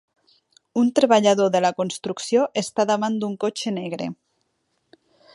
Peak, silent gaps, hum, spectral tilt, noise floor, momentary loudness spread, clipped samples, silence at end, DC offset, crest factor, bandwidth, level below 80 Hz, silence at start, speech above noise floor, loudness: -4 dBFS; none; none; -4.5 dB/octave; -72 dBFS; 12 LU; under 0.1%; 1.2 s; under 0.1%; 20 dB; 11.5 kHz; -72 dBFS; 0.75 s; 51 dB; -21 LUFS